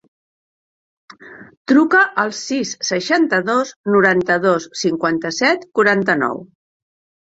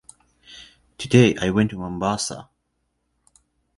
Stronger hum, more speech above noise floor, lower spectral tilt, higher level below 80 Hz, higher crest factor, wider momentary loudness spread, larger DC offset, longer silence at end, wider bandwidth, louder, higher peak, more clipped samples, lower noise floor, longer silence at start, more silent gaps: neither; first, over 73 dB vs 53 dB; second, -4 dB/octave vs -5.5 dB/octave; second, -62 dBFS vs -50 dBFS; about the same, 18 dB vs 22 dB; second, 8 LU vs 26 LU; neither; second, 0.75 s vs 1.35 s; second, 8 kHz vs 11.5 kHz; first, -16 LUFS vs -20 LUFS; about the same, 0 dBFS vs 0 dBFS; neither; first, under -90 dBFS vs -73 dBFS; first, 1.2 s vs 0.5 s; first, 1.57-1.65 s, 3.76-3.84 s vs none